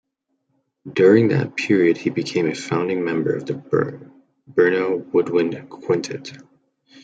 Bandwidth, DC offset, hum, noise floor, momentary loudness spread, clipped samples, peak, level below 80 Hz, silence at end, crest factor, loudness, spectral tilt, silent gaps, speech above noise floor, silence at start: 9 kHz; under 0.1%; none; -73 dBFS; 12 LU; under 0.1%; -2 dBFS; -66 dBFS; 0.65 s; 18 dB; -20 LUFS; -6.5 dB/octave; none; 53 dB; 0.85 s